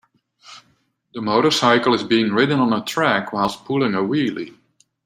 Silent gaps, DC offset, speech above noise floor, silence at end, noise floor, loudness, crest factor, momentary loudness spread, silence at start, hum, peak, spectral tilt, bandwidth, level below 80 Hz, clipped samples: none; under 0.1%; 45 dB; 0.55 s; -63 dBFS; -18 LUFS; 18 dB; 11 LU; 0.5 s; none; -2 dBFS; -5 dB/octave; 16 kHz; -60 dBFS; under 0.1%